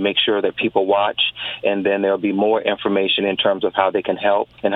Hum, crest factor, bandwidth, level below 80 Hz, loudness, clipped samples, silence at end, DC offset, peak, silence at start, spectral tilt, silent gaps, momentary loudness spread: none; 18 dB; 4.6 kHz; -60 dBFS; -18 LUFS; under 0.1%; 0 s; under 0.1%; 0 dBFS; 0 s; -7.5 dB/octave; none; 3 LU